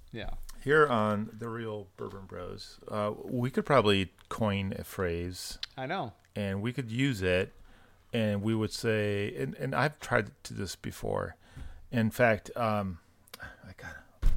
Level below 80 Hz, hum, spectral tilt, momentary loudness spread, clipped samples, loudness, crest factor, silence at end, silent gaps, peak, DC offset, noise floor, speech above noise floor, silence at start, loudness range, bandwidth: -42 dBFS; none; -6 dB/octave; 18 LU; under 0.1%; -31 LUFS; 22 dB; 0 s; none; -10 dBFS; under 0.1%; -56 dBFS; 25 dB; 0.05 s; 2 LU; 16.5 kHz